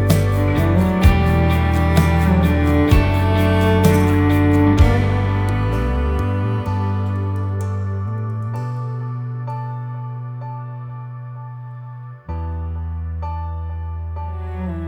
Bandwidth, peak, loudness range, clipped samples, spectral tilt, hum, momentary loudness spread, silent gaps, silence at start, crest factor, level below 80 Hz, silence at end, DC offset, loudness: 20 kHz; 0 dBFS; 14 LU; under 0.1%; -7.5 dB/octave; none; 16 LU; none; 0 s; 18 dB; -26 dBFS; 0 s; under 0.1%; -19 LUFS